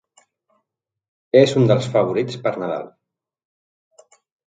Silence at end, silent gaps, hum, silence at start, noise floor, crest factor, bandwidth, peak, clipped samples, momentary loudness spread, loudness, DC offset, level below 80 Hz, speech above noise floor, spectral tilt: 1.6 s; none; none; 1.35 s; -79 dBFS; 22 dB; 9.2 kHz; 0 dBFS; under 0.1%; 13 LU; -18 LUFS; under 0.1%; -64 dBFS; 62 dB; -6.5 dB/octave